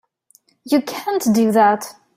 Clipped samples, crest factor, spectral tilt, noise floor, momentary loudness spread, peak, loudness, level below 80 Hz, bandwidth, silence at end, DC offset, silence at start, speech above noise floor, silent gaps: under 0.1%; 16 dB; -5 dB/octave; -57 dBFS; 8 LU; -2 dBFS; -17 LUFS; -62 dBFS; 16 kHz; 0.25 s; under 0.1%; 0.65 s; 41 dB; none